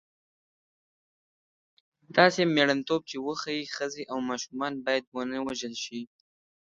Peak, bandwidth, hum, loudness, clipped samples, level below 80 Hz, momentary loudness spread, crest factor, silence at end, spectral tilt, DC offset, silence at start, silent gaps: -4 dBFS; 9.2 kHz; none; -28 LUFS; under 0.1%; -72 dBFS; 12 LU; 26 dB; 0.7 s; -4 dB/octave; under 0.1%; 2.1 s; 5.07-5.12 s